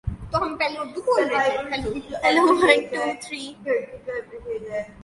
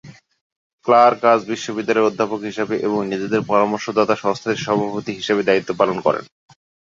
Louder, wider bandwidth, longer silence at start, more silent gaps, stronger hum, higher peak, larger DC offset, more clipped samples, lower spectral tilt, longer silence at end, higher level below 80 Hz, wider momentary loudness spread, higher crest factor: second, -23 LUFS vs -19 LUFS; first, 11.5 kHz vs 7.6 kHz; about the same, 0.05 s vs 0.05 s; second, none vs 0.41-0.78 s; neither; about the same, -2 dBFS vs -2 dBFS; neither; neither; about the same, -4.5 dB/octave vs -5.5 dB/octave; second, 0 s vs 0.6 s; first, -46 dBFS vs -62 dBFS; first, 15 LU vs 10 LU; about the same, 22 dB vs 18 dB